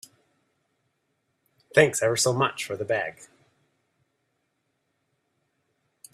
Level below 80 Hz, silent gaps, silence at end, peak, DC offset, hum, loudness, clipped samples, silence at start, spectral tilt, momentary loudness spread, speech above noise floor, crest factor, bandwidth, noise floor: -68 dBFS; none; 2.9 s; -4 dBFS; under 0.1%; none; -24 LUFS; under 0.1%; 1.75 s; -3.5 dB/octave; 9 LU; 52 dB; 26 dB; 15 kHz; -76 dBFS